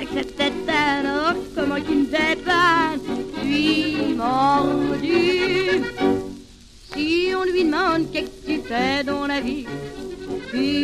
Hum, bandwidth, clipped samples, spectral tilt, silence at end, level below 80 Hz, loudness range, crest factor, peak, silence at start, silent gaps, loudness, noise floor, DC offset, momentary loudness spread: none; 14 kHz; under 0.1%; -5 dB/octave; 0 s; -46 dBFS; 3 LU; 14 dB; -6 dBFS; 0 s; none; -21 LUFS; -44 dBFS; under 0.1%; 10 LU